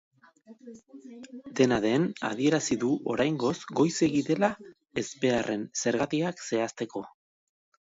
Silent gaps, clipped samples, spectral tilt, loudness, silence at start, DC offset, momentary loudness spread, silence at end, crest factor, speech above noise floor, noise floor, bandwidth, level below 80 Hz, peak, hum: none; under 0.1%; -5 dB/octave; -28 LUFS; 0.5 s; under 0.1%; 21 LU; 0.85 s; 20 dB; 27 dB; -55 dBFS; 8 kHz; -64 dBFS; -8 dBFS; none